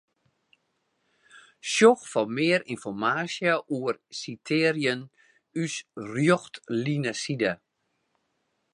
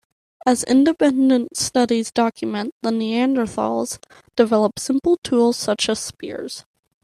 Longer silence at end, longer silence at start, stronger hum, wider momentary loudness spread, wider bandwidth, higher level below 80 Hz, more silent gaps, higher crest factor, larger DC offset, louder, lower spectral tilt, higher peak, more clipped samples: first, 1.2 s vs 0.45 s; first, 1.35 s vs 0.45 s; neither; first, 15 LU vs 12 LU; second, 11.5 kHz vs 13 kHz; second, -74 dBFS vs -58 dBFS; second, none vs 2.72-2.80 s, 5.18-5.22 s; first, 22 dB vs 16 dB; neither; second, -26 LUFS vs -19 LUFS; about the same, -4.5 dB/octave vs -4 dB/octave; about the same, -6 dBFS vs -4 dBFS; neither